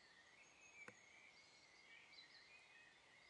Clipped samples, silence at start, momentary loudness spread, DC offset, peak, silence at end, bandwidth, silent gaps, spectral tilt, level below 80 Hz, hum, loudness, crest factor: under 0.1%; 0 s; 5 LU; under 0.1%; -44 dBFS; 0 s; 10 kHz; none; -1 dB/octave; under -90 dBFS; none; -64 LUFS; 24 dB